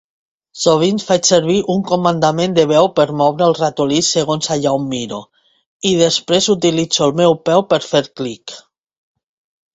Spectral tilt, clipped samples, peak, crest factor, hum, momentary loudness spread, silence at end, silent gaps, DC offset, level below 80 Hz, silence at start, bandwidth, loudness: -4 dB/octave; under 0.1%; 0 dBFS; 16 dB; none; 10 LU; 1.15 s; 5.66-5.80 s; under 0.1%; -54 dBFS; 0.55 s; 8.2 kHz; -15 LUFS